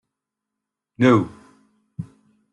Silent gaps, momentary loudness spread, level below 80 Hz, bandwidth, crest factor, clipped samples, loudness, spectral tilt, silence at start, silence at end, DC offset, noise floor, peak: none; 23 LU; -60 dBFS; 8.6 kHz; 20 dB; under 0.1%; -18 LUFS; -7.5 dB/octave; 1 s; 0.5 s; under 0.1%; -84 dBFS; -4 dBFS